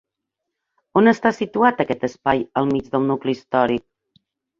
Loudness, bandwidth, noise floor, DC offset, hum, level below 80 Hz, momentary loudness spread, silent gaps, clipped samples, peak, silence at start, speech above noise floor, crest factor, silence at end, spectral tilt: -20 LUFS; 7.4 kHz; -81 dBFS; under 0.1%; none; -56 dBFS; 7 LU; none; under 0.1%; -2 dBFS; 0.95 s; 62 dB; 20 dB; 0.8 s; -7 dB/octave